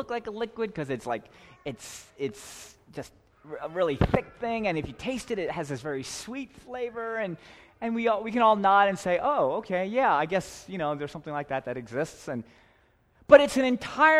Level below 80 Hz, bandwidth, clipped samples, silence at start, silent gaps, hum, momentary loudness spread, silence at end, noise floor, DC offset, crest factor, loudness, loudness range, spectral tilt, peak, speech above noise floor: -50 dBFS; 14 kHz; under 0.1%; 0 s; none; none; 19 LU; 0 s; -63 dBFS; under 0.1%; 24 dB; -27 LUFS; 9 LU; -5 dB/octave; -2 dBFS; 36 dB